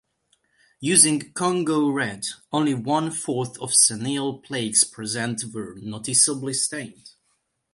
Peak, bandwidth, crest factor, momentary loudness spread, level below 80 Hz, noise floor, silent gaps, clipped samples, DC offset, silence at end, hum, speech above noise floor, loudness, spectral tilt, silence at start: -2 dBFS; 12 kHz; 24 dB; 15 LU; -66 dBFS; -71 dBFS; none; under 0.1%; under 0.1%; 0.65 s; none; 48 dB; -21 LUFS; -2.5 dB/octave; 0.8 s